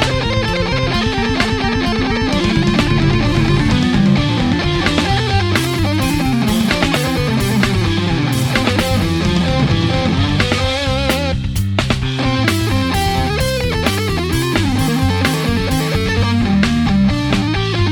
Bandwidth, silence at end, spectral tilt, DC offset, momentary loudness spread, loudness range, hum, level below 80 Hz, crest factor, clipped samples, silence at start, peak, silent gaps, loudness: 20 kHz; 0 s; -5.5 dB/octave; under 0.1%; 3 LU; 2 LU; none; -26 dBFS; 14 dB; under 0.1%; 0 s; 0 dBFS; none; -15 LUFS